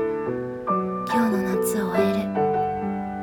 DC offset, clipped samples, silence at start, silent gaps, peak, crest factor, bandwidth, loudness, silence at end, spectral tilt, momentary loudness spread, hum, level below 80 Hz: under 0.1%; under 0.1%; 0 s; none; -8 dBFS; 16 dB; 18 kHz; -24 LUFS; 0 s; -6 dB/octave; 6 LU; none; -54 dBFS